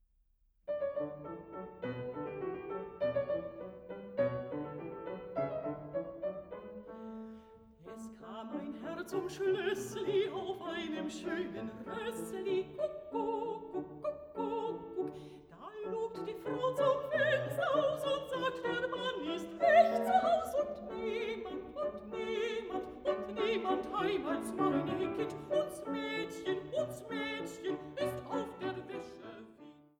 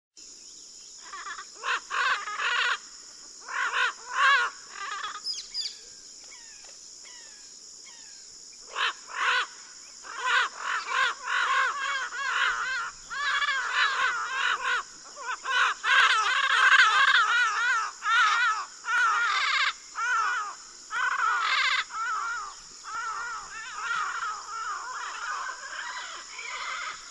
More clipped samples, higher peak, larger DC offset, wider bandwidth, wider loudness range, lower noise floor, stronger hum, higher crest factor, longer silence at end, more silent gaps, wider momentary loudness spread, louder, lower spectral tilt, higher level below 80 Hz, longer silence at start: neither; second, -14 dBFS vs -6 dBFS; neither; first, 20 kHz vs 11.5 kHz; second, 9 LU vs 12 LU; first, -72 dBFS vs -48 dBFS; neither; about the same, 22 dB vs 22 dB; first, 0.2 s vs 0 s; neither; second, 15 LU vs 22 LU; second, -36 LUFS vs -26 LUFS; first, -5.5 dB/octave vs 3 dB/octave; about the same, -68 dBFS vs -68 dBFS; first, 0.65 s vs 0.15 s